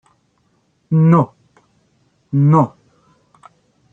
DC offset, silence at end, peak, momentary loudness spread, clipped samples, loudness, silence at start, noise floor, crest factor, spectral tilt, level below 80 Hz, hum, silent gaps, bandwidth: under 0.1%; 1.25 s; -2 dBFS; 10 LU; under 0.1%; -15 LUFS; 0.9 s; -62 dBFS; 16 dB; -11 dB/octave; -60 dBFS; none; none; 2.9 kHz